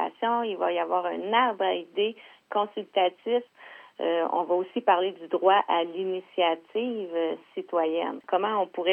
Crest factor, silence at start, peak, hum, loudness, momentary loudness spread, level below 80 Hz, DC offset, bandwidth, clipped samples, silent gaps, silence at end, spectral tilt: 20 dB; 0 s; -6 dBFS; none; -27 LUFS; 8 LU; under -90 dBFS; under 0.1%; 4.3 kHz; under 0.1%; none; 0 s; -6.5 dB/octave